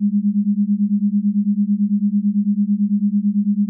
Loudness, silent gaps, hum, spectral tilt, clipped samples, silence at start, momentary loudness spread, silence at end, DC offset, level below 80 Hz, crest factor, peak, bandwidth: -18 LUFS; none; none; -27 dB/octave; under 0.1%; 0 s; 1 LU; 0 s; under 0.1%; -86 dBFS; 6 dB; -12 dBFS; 0.3 kHz